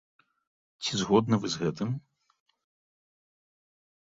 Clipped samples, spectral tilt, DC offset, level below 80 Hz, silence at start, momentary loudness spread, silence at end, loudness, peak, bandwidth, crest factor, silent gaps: under 0.1%; -5.5 dB/octave; under 0.1%; -64 dBFS; 0.8 s; 10 LU; 2.05 s; -29 LUFS; -10 dBFS; 7.8 kHz; 22 dB; none